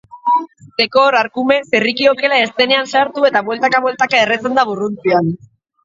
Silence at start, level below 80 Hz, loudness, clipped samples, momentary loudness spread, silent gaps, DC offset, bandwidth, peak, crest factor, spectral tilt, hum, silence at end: 0.15 s; -60 dBFS; -14 LUFS; under 0.1%; 6 LU; none; under 0.1%; 7.6 kHz; 0 dBFS; 14 dB; -4.5 dB/octave; none; 0.5 s